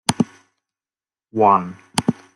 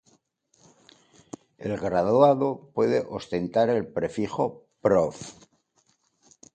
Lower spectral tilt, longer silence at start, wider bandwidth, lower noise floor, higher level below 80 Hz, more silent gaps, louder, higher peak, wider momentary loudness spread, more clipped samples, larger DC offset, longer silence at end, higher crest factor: second, -5 dB/octave vs -6.5 dB/octave; second, 0.1 s vs 1.6 s; first, 12 kHz vs 9.2 kHz; first, under -90 dBFS vs -68 dBFS; about the same, -56 dBFS vs -60 dBFS; neither; first, -20 LUFS vs -25 LUFS; first, 0 dBFS vs -6 dBFS; second, 9 LU vs 21 LU; neither; neither; second, 0.25 s vs 1.25 s; about the same, 22 dB vs 22 dB